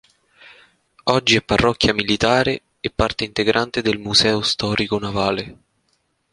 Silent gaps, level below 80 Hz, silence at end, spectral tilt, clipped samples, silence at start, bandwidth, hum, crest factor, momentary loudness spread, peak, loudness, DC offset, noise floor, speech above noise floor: none; -40 dBFS; 0.8 s; -4 dB/octave; under 0.1%; 1.05 s; 11 kHz; none; 20 dB; 8 LU; 0 dBFS; -18 LUFS; under 0.1%; -67 dBFS; 48 dB